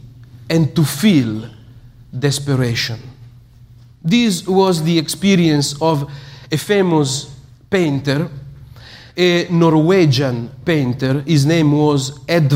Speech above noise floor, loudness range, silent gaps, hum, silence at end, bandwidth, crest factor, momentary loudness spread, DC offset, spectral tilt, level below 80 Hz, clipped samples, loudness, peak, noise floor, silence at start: 28 dB; 5 LU; none; none; 0 s; 16 kHz; 14 dB; 12 LU; under 0.1%; -5.5 dB/octave; -48 dBFS; under 0.1%; -16 LUFS; -2 dBFS; -43 dBFS; 0.05 s